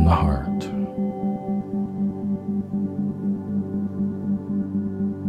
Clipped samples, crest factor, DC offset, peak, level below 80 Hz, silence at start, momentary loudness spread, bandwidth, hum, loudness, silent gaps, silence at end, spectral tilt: under 0.1%; 18 dB; under 0.1%; -6 dBFS; -36 dBFS; 0 s; 3 LU; 8 kHz; none; -26 LUFS; none; 0 s; -9.5 dB/octave